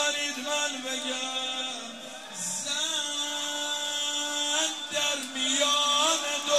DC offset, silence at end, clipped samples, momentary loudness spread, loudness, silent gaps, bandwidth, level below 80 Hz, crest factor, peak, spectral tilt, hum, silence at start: 0.1%; 0 s; under 0.1%; 9 LU; -27 LUFS; none; 15.5 kHz; -82 dBFS; 18 dB; -10 dBFS; 1 dB/octave; none; 0 s